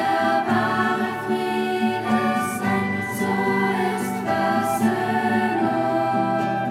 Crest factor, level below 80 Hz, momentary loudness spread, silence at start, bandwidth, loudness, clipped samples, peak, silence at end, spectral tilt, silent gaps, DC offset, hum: 14 dB; -62 dBFS; 3 LU; 0 s; 16 kHz; -22 LUFS; under 0.1%; -8 dBFS; 0 s; -5.5 dB/octave; none; under 0.1%; none